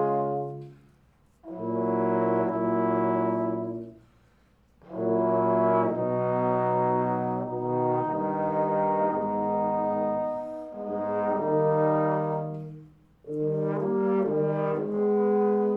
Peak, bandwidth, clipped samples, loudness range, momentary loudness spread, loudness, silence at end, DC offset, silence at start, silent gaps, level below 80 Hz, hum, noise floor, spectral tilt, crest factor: -12 dBFS; 4.4 kHz; under 0.1%; 2 LU; 11 LU; -27 LUFS; 0 s; under 0.1%; 0 s; none; -66 dBFS; none; -62 dBFS; -11 dB/octave; 14 dB